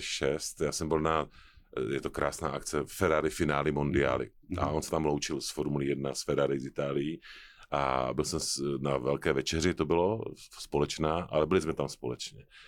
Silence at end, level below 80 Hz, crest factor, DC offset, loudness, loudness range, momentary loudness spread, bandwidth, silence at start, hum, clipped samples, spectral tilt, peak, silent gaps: 0 s; -50 dBFS; 18 dB; under 0.1%; -31 LUFS; 2 LU; 9 LU; 17.5 kHz; 0 s; none; under 0.1%; -4.5 dB/octave; -14 dBFS; none